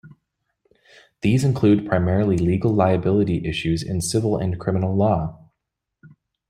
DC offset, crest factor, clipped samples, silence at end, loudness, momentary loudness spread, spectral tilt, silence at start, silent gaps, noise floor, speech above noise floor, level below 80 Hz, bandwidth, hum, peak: under 0.1%; 18 dB; under 0.1%; 1.15 s; -21 LUFS; 6 LU; -7 dB/octave; 0.05 s; none; -81 dBFS; 61 dB; -46 dBFS; 14.5 kHz; none; -4 dBFS